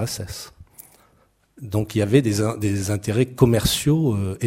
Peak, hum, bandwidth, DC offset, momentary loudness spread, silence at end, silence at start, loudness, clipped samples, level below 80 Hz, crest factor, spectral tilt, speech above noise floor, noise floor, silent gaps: 0 dBFS; none; 16 kHz; under 0.1%; 15 LU; 0 s; 0 s; -21 LUFS; under 0.1%; -42 dBFS; 20 dB; -5.5 dB/octave; 40 dB; -61 dBFS; none